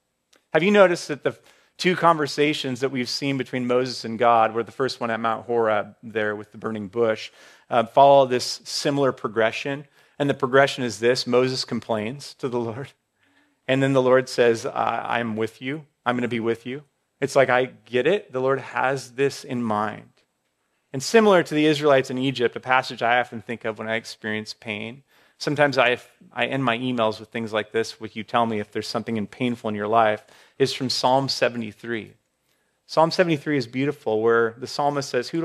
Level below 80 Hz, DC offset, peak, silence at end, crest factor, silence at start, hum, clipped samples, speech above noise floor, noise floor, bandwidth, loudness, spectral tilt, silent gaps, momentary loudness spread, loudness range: -72 dBFS; under 0.1%; -2 dBFS; 0 s; 20 dB; 0.55 s; none; under 0.1%; 50 dB; -72 dBFS; 14 kHz; -23 LUFS; -5 dB/octave; none; 12 LU; 4 LU